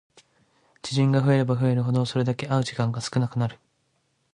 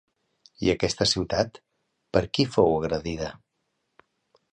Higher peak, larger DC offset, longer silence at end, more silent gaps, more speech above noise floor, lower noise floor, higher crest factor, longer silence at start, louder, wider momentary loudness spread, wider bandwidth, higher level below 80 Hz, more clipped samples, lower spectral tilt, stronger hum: about the same, -8 dBFS vs -6 dBFS; neither; second, 0.8 s vs 1.2 s; neither; second, 48 dB vs 52 dB; second, -71 dBFS vs -77 dBFS; second, 16 dB vs 22 dB; first, 0.85 s vs 0.6 s; about the same, -24 LUFS vs -25 LUFS; about the same, 8 LU vs 10 LU; about the same, 10.5 kHz vs 10.5 kHz; second, -60 dBFS vs -48 dBFS; neither; first, -7 dB/octave vs -4.5 dB/octave; neither